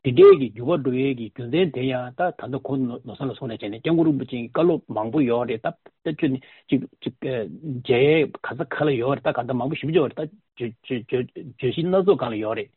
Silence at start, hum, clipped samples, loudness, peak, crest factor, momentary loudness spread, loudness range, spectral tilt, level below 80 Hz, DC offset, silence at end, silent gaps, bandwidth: 0.05 s; none; under 0.1%; -23 LUFS; -2 dBFS; 20 dB; 12 LU; 3 LU; -6 dB/octave; -60 dBFS; under 0.1%; 0.1 s; none; 4.3 kHz